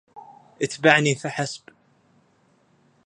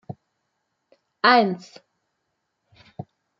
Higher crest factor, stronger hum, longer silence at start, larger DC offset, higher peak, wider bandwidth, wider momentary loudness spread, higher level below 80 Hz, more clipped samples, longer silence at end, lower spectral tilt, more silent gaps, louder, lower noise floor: about the same, 26 dB vs 24 dB; neither; about the same, 0.15 s vs 0.1 s; neither; about the same, 0 dBFS vs -2 dBFS; first, 11 kHz vs 7.6 kHz; second, 14 LU vs 25 LU; about the same, -70 dBFS vs -74 dBFS; neither; first, 1.5 s vs 0.35 s; second, -4 dB/octave vs -5.5 dB/octave; neither; about the same, -21 LUFS vs -19 LUFS; second, -62 dBFS vs -77 dBFS